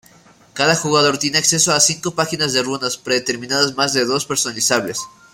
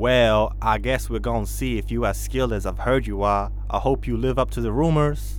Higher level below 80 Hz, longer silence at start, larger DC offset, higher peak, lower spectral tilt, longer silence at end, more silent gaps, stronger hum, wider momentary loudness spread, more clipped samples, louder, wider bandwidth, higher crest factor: second, -58 dBFS vs -28 dBFS; first, 0.55 s vs 0 s; neither; first, 0 dBFS vs -6 dBFS; second, -2 dB/octave vs -6 dB/octave; first, 0.25 s vs 0 s; neither; neither; about the same, 7 LU vs 6 LU; neither; first, -16 LUFS vs -23 LUFS; about the same, 16.5 kHz vs 17.5 kHz; about the same, 18 dB vs 16 dB